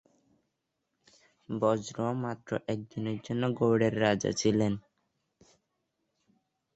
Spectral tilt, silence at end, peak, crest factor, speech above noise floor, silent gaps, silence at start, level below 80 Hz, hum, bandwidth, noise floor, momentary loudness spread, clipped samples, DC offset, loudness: -6 dB/octave; 1.95 s; -12 dBFS; 20 dB; 53 dB; none; 1.5 s; -64 dBFS; none; 8.2 kHz; -82 dBFS; 10 LU; under 0.1%; under 0.1%; -30 LUFS